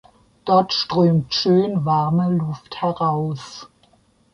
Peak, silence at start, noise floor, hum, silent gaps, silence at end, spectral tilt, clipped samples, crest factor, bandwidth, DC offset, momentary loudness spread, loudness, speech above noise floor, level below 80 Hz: -4 dBFS; 0.45 s; -58 dBFS; none; none; 0.65 s; -7 dB/octave; under 0.1%; 16 dB; 7.2 kHz; under 0.1%; 13 LU; -19 LUFS; 39 dB; -56 dBFS